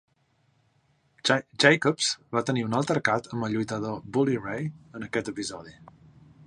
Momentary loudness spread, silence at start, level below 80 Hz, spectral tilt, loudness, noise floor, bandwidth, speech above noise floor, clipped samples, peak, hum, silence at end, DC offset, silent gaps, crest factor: 14 LU; 1.25 s; -64 dBFS; -4.5 dB/octave; -26 LUFS; -68 dBFS; 11.5 kHz; 41 dB; under 0.1%; -2 dBFS; none; 0.6 s; under 0.1%; none; 26 dB